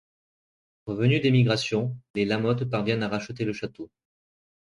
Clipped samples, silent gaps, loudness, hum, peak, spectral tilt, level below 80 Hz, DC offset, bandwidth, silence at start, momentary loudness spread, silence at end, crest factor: under 0.1%; 2.10-2.14 s; -26 LUFS; none; -8 dBFS; -6.5 dB/octave; -60 dBFS; under 0.1%; 11 kHz; 0.85 s; 16 LU; 0.75 s; 20 dB